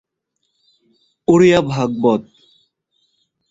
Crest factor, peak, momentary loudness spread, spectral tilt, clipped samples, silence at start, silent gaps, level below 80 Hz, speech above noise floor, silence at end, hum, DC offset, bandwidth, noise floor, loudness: 18 dB; 0 dBFS; 11 LU; -6.5 dB/octave; under 0.1%; 1.3 s; none; -52 dBFS; 58 dB; 1.3 s; none; under 0.1%; 7.8 kHz; -72 dBFS; -15 LUFS